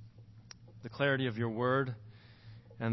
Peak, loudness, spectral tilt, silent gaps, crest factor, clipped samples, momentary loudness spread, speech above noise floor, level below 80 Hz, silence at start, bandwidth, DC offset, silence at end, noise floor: -18 dBFS; -33 LUFS; -5 dB/octave; none; 18 dB; under 0.1%; 24 LU; 22 dB; -68 dBFS; 0 s; 6 kHz; under 0.1%; 0 s; -55 dBFS